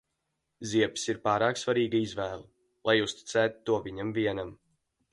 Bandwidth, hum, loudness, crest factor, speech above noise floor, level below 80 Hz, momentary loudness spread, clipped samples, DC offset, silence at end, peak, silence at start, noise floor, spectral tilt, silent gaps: 11.5 kHz; none; -29 LUFS; 20 dB; 52 dB; -62 dBFS; 10 LU; under 0.1%; under 0.1%; 0.6 s; -10 dBFS; 0.6 s; -81 dBFS; -4.5 dB/octave; none